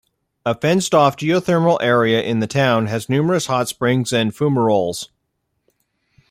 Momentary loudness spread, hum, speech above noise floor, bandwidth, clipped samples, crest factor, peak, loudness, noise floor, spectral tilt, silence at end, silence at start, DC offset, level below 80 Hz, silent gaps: 6 LU; none; 55 dB; 16 kHz; under 0.1%; 16 dB; -2 dBFS; -17 LUFS; -72 dBFS; -5.5 dB/octave; 1.25 s; 0.45 s; under 0.1%; -58 dBFS; none